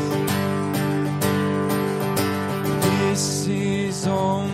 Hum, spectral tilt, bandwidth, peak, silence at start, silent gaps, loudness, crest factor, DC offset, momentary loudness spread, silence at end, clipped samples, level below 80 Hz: none; -5 dB/octave; 16 kHz; -6 dBFS; 0 s; none; -22 LUFS; 14 dB; under 0.1%; 3 LU; 0 s; under 0.1%; -56 dBFS